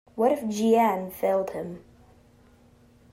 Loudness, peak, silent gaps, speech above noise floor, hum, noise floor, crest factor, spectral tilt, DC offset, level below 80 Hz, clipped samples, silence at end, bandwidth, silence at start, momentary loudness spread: -25 LUFS; -10 dBFS; none; 32 dB; none; -57 dBFS; 16 dB; -6 dB/octave; under 0.1%; -62 dBFS; under 0.1%; 1.35 s; 16 kHz; 0.15 s; 16 LU